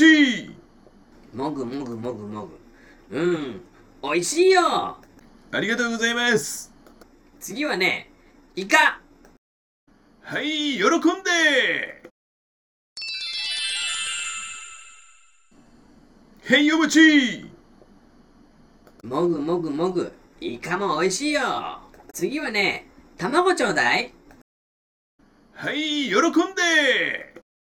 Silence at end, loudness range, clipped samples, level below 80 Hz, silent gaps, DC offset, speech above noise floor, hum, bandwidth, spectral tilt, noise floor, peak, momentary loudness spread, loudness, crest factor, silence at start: 0.35 s; 7 LU; under 0.1%; -60 dBFS; 9.38-9.87 s, 12.11-12.96 s, 24.42-25.19 s; under 0.1%; 35 dB; none; 18 kHz; -3 dB/octave; -56 dBFS; 0 dBFS; 18 LU; -21 LUFS; 22 dB; 0 s